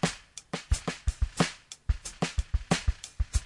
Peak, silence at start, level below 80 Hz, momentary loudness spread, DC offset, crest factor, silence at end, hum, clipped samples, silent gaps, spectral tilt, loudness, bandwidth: -10 dBFS; 0.05 s; -34 dBFS; 10 LU; under 0.1%; 20 dB; 0 s; none; under 0.1%; none; -4.5 dB/octave; -33 LUFS; 11.5 kHz